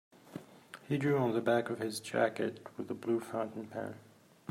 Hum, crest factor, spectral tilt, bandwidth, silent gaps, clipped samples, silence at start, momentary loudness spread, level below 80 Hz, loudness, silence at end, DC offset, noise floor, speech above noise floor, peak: none; 20 dB; -6 dB/octave; 16 kHz; none; under 0.1%; 0.25 s; 20 LU; -80 dBFS; -35 LUFS; 0 s; under 0.1%; -54 dBFS; 20 dB; -16 dBFS